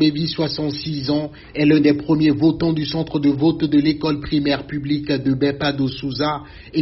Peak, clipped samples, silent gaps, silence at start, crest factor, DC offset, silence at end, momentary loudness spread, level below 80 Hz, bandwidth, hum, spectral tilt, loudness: -4 dBFS; under 0.1%; none; 0 s; 16 dB; under 0.1%; 0 s; 8 LU; -44 dBFS; 6 kHz; none; -5.5 dB/octave; -19 LUFS